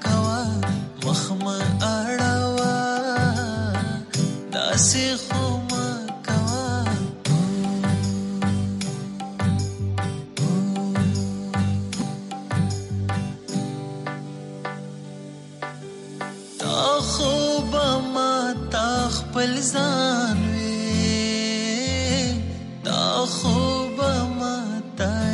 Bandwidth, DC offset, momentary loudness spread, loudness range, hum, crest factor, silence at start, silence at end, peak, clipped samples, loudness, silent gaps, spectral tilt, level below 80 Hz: 11.5 kHz; under 0.1%; 11 LU; 6 LU; none; 18 dB; 0 s; 0 s; -6 dBFS; under 0.1%; -23 LUFS; none; -4.5 dB/octave; -44 dBFS